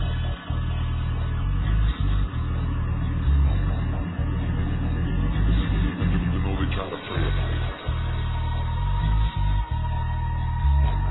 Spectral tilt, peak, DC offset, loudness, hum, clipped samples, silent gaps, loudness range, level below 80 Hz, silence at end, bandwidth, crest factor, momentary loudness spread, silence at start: -11 dB/octave; -10 dBFS; under 0.1%; -26 LUFS; none; under 0.1%; none; 2 LU; -26 dBFS; 0 s; 4.1 kHz; 12 dB; 5 LU; 0 s